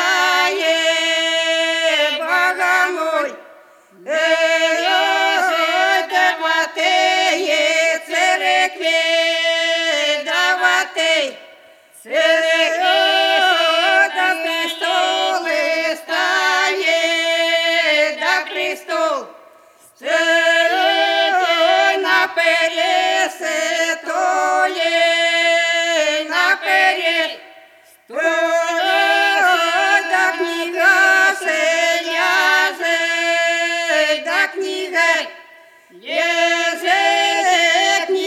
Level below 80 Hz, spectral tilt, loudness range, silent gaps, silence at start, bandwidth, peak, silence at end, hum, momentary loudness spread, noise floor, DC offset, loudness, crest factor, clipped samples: -80 dBFS; 1 dB/octave; 3 LU; none; 0 s; 15.5 kHz; 0 dBFS; 0 s; none; 6 LU; -48 dBFS; under 0.1%; -15 LUFS; 16 dB; under 0.1%